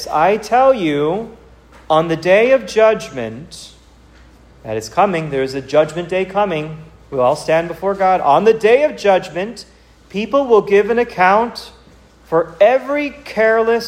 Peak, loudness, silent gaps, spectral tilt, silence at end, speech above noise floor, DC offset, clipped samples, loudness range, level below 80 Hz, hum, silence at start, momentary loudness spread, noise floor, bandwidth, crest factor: 0 dBFS; -15 LUFS; none; -5.5 dB/octave; 0 s; 31 dB; under 0.1%; under 0.1%; 5 LU; -48 dBFS; none; 0 s; 14 LU; -45 dBFS; 15 kHz; 16 dB